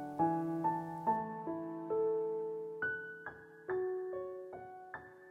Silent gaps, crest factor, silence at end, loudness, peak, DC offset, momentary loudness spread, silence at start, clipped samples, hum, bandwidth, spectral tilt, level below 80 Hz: none; 18 dB; 0 s; -38 LUFS; -20 dBFS; under 0.1%; 15 LU; 0 s; under 0.1%; none; 11 kHz; -9 dB/octave; -76 dBFS